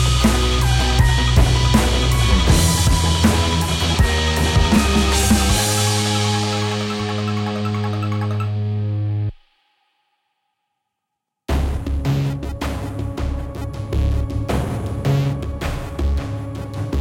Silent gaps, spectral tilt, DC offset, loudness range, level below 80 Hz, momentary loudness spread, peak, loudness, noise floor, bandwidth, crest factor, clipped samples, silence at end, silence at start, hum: none; -4.5 dB/octave; under 0.1%; 10 LU; -24 dBFS; 10 LU; 0 dBFS; -19 LUFS; -80 dBFS; 17 kHz; 18 dB; under 0.1%; 0 s; 0 s; none